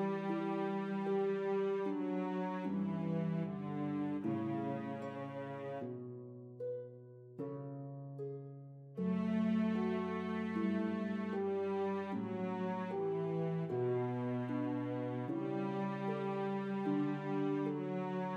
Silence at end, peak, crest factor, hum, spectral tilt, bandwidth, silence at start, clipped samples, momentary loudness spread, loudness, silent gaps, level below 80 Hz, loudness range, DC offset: 0 s; -24 dBFS; 14 dB; none; -9 dB/octave; 7 kHz; 0 s; under 0.1%; 10 LU; -39 LUFS; none; -84 dBFS; 7 LU; under 0.1%